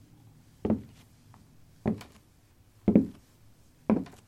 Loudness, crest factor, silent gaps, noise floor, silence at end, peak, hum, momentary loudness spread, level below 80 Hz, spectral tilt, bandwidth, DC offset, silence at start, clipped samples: -30 LUFS; 26 dB; none; -60 dBFS; 0.2 s; -6 dBFS; none; 14 LU; -56 dBFS; -9 dB/octave; 13 kHz; under 0.1%; 0.65 s; under 0.1%